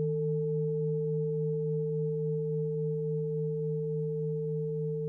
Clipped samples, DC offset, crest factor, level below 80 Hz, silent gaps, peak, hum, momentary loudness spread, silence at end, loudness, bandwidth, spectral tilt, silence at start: under 0.1%; under 0.1%; 8 dB; -68 dBFS; none; -24 dBFS; none; 2 LU; 0 s; -32 LUFS; 0.9 kHz; -14.5 dB/octave; 0 s